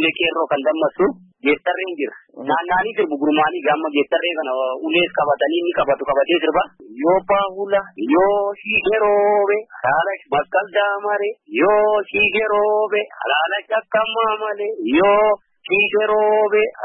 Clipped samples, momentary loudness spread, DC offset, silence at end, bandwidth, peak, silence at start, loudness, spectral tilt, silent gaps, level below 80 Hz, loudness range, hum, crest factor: under 0.1%; 6 LU; under 0.1%; 0 s; 4 kHz; -4 dBFS; 0 s; -18 LUFS; -9.5 dB/octave; none; -54 dBFS; 2 LU; none; 14 dB